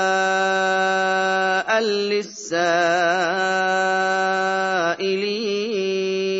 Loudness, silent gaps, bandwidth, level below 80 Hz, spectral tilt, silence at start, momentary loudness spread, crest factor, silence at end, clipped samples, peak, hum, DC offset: -20 LUFS; none; 8 kHz; -78 dBFS; -3.5 dB/octave; 0 s; 4 LU; 14 dB; 0 s; under 0.1%; -6 dBFS; none; under 0.1%